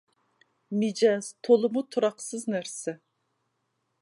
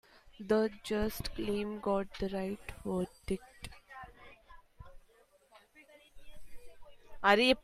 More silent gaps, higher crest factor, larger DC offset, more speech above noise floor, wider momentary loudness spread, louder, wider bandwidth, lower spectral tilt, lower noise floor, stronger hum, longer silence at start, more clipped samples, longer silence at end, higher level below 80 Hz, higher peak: neither; about the same, 20 dB vs 24 dB; neither; first, 51 dB vs 33 dB; second, 12 LU vs 22 LU; first, -27 LUFS vs -34 LUFS; second, 11.5 kHz vs 15.5 kHz; about the same, -4.5 dB/octave vs -5 dB/octave; first, -77 dBFS vs -66 dBFS; neither; first, 0.7 s vs 0.25 s; neither; first, 1.05 s vs 0.05 s; second, -84 dBFS vs -54 dBFS; first, -8 dBFS vs -12 dBFS